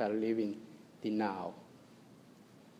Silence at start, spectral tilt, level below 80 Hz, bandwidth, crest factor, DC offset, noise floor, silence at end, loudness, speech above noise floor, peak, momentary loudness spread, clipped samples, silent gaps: 0 s; -7 dB/octave; -84 dBFS; 11 kHz; 16 dB; under 0.1%; -59 dBFS; 0.1 s; -37 LUFS; 23 dB; -22 dBFS; 25 LU; under 0.1%; none